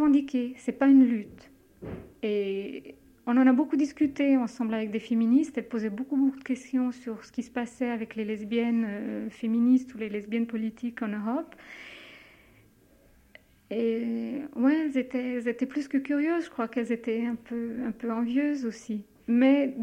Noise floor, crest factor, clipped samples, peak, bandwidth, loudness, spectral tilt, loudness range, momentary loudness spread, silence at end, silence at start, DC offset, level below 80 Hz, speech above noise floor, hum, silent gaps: -60 dBFS; 16 dB; under 0.1%; -12 dBFS; 9 kHz; -28 LUFS; -6.5 dB/octave; 9 LU; 14 LU; 0 s; 0 s; under 0.1%; -66 dBFS; 33 dB; none; none